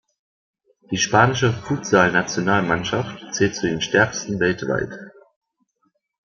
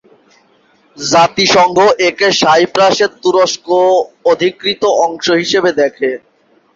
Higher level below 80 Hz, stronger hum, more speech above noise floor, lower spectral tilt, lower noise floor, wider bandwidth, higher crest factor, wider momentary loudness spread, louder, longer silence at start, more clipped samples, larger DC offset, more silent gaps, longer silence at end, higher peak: about the same, -54 dBFS vs -54 dBFS; neither; first, 49 dB vs 40 dB; first, -4.5 dB/octave vs -3 dB/octave; first, -69 dBFS vs -52 dBFS; about the same, 7.4 kHz vs 7.8 kHz; first, 20 dB vs 12 dB; first, 10 LU vs 6 LU; second, -20 LUFS vs -11 LUFS; about the same, 0.9 s vs 1 s; neither; neither; neither; first, 1.15 s vs 0.6 s; about the same, -2 dBFS vs 0 dBFS